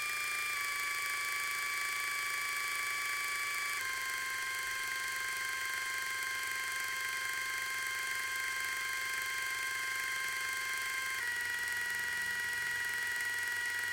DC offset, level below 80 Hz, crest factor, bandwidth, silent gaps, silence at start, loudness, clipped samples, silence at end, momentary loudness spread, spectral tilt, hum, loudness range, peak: under 0.1%; -72 dBFS; 16 dB; 17 kHz; none; 0 s; -35 LUFS; under 0.1%; 0 s; 1 LU; 1.5 dB/octave; none; 1 LU; -20 dBFS